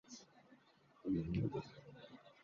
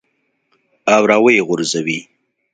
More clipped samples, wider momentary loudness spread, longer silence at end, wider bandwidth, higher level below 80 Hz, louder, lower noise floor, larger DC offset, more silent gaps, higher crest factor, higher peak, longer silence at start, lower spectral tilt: neither; first, 19 LU vs 12 LU; second, 0.1 s vs 0.5 s; second, 7.2 kHz vs 9.4 kHz; about the same, -62 dBFS vs -64 dBFS; second, -42 LUFS vs -14 LUFS; about the same, -70 dBFS vs -67 dBFS; neither; neither; about the same, 18 dB vs 16 dB; second, -28 dBFS vs 0 dBFS; second, 0.1 s vs 0.85 s; first, -8 dB/octave vs -4 dB/octave